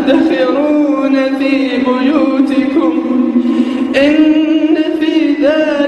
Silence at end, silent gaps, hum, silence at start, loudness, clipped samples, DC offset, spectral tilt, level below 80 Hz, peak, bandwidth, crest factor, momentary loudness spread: 0 s; none; none; 0 s; -12 LUFS; under 0.1%; under 0.1%; -5.5 dB/octave; -50 dBFS; 0 dBFS; 8.8 kHz; 10 dB; 3 LU